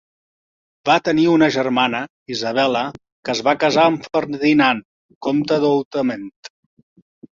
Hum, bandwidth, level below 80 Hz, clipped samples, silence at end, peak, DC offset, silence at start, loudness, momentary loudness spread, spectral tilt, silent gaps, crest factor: none; 7.4 kHz; -60 dBFS; under 0.1%; 0.9 s; -2 dBFS; under 0.1%; 0.85 s; -18 LUFS; 12 LU; -5 dB/octave; 2.10-2.26 s, 3.12-3.23 s, 4.85-5.09 s, 5.15-5.21 s, 5.85-5.91 s, 6.36-6.43 s; 18 dB